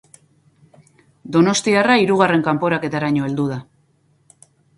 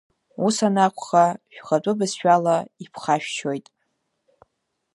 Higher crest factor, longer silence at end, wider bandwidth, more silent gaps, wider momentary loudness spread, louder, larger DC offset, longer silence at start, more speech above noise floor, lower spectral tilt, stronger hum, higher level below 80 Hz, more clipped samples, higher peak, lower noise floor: about the same, 20 dB vs 20 dB; second, 1.15 s vs 1.35 s; about the same, 11.5 kHz vs 11.5 kHz; neither; second, 8 LU vs 12 LU; first, -17 LUFS vs -21 LUFS; neither; first, 1.25 s vs 0.4 s; second, 43 dB vs 52 dB; about the same, -5 dB/octave vs -5 dB/octave; neither; first, -60 dBFS vs -74 dBFS; neither; first, 0 dBFS vs -4 dBFS; second, -60 dBFS vs -74 dBFS